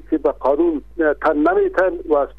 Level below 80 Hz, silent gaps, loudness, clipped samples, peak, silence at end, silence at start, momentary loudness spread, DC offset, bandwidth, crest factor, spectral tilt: -42 dBFS; none; -18 LUFS; under 0.1%; -6 dBFS; 0.05 s; 0.1 s; 4 LU; 0.6%; 5.4 kHz; 12 dB; -7.5 dB/octave